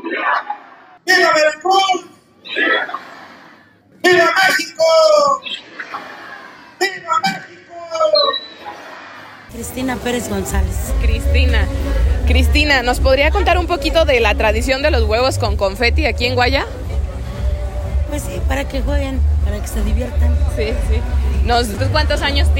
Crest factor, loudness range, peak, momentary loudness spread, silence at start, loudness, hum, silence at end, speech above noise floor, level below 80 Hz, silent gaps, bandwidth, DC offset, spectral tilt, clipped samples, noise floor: 16 dB; 5 LU; 0 dBFS; 17 LU; 0 s; -16 LUFS; none; 0 s; 32 dB; -20 dBFS; none; 16.5 kHz; under 0.1%; -5 dB/octave; under 0.1%; -47 dBFS